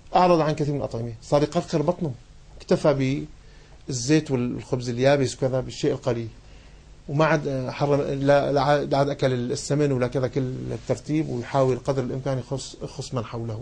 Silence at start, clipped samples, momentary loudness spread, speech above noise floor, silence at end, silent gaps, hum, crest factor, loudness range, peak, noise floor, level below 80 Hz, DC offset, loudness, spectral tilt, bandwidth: 0.05 s; under 0.1%; 11 LU; 23 dB; 0 s; none; none; 18 dB; 3 LU; -6 dBFS; -47 dBFS; -48 dBFS; under 0.1%; -24 LUFS; -6 dB/octave; 9.8 kHz